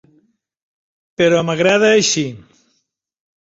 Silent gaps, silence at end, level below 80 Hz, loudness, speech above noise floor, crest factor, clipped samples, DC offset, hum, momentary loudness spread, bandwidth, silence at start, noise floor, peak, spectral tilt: none; 1.1 s; -58 dBFS; -14 LUFS; 55 dB; 16 dB; under 0.1%; under 0.1%; none; 12 LU; 8 kHz; 1.2 s; -69 dBFS; -2 dBFS; -3.5 dB/octave